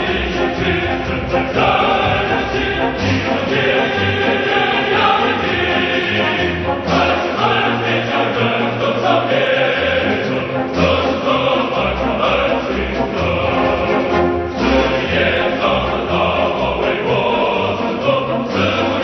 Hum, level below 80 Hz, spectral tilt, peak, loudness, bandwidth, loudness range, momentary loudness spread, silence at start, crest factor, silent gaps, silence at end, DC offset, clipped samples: none; -36 dBFS; -6 dB/octave; 0 dBFS; -16 LUFS; 6.4 kHz; 1 LU; 4 LU; 0 s; 16 dB; none; 0 s; under 0.1%; under 0.1%